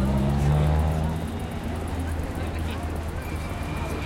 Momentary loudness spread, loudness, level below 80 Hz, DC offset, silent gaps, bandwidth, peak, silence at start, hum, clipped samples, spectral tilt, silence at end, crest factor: 9 LU; -27 LUFS; -32 dBFS; under 0.1%; none; 16.5 kHz; -12 dBFS; 0 s; none; under 0.1%; -7 dB/octave; 0 s; 14 dB